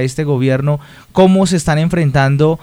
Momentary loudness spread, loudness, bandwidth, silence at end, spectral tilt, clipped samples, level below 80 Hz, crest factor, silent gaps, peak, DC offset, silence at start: 8 LU; -13 LUFS; 12.5 kHz; 0.05 s; -6.5 dB/octave; under 0.1%; -38 dBFS; 12 dB; none; 0 dBFS; under 0.1%; 0 s